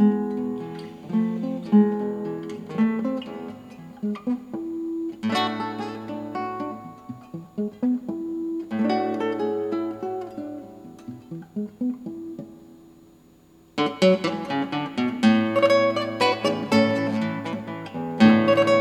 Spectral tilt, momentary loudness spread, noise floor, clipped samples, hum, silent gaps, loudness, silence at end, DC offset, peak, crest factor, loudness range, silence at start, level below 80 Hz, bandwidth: -6.5 dB/octave; 18 LU; -54 dBFS; under 0.1%; none; none; -24 LUFS; 0 s; under 0.1%; -4 dBFS; 20 dB; 10 LU; 0 s; -66 dBFS; 11.5 kHz